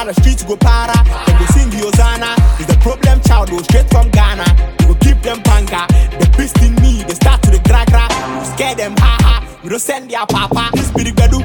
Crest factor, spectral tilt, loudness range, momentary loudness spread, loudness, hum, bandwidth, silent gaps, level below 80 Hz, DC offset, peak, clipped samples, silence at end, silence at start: 10 dB; -5.5 dB/octave; 2 LU; 6 LU; -12 LUFS; none; 18 kHz; none; -12 dBFS; under 0.1%; 0 dBFS; under 0.1%; 0 s; 0 s